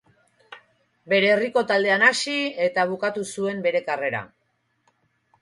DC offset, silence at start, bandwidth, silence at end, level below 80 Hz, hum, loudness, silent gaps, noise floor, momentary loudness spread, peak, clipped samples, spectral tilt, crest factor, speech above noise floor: under 0.1%; 0.5 s; 11.5 kHz; 1.15 s; -70 dBFS; none; -22 LUFS; none; -71 dBFS; 10 LU; -4 dBFS; under 0.1%; -3.5 dB/octave; 20 dB; 49 dB